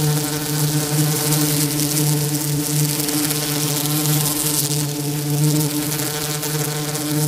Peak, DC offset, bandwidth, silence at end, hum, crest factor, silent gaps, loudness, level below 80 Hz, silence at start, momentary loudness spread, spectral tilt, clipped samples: -2 dBFS; under 0.1%; 16.5 kHz; 0 s; none; 18 dB; none; -19 LUFS; -50 dBFS; 0 s; 4 LU; -4 dB/octave; under 0.1%